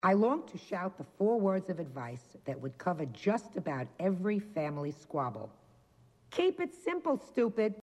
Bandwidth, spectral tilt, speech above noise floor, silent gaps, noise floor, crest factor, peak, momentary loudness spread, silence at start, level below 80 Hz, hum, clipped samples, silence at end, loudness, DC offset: 11.5 kHz; -7.5 dB/octave; 31 dB; none; -64 dBFS; 18 dB; -16 dBFS; 11 LU; 0.05 s; -76 dBFS; none; under 0.1%; 0 s; -34 LUFS; under 0.1%